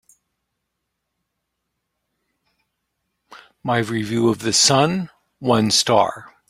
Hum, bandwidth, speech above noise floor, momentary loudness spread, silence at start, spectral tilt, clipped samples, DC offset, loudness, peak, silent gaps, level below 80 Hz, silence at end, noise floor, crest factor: none; 16 kHz; 60 dB; 13 LU; 3.3 s; -3.5 dB/octave; under 0.1%; under 0.1%; -18 LUFS; -2 dBFS; none; -60 dBFS; 0.25 s; -78 dBFS; 20 dB